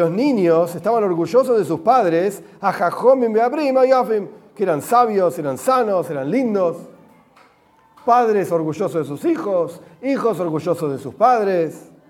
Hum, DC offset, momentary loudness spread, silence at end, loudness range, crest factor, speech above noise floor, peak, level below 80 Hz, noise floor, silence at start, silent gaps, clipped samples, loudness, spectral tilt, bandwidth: none; under 0.1%; 8 LU; 0.3 s; 4 LU; 16 dB; 37 dB; -2 dBFS; -70 dBFS; -54 dBFS; 0 s; none; under 0.1%; -18 LUFS; -6.5 dB/octave; 16.5 kHz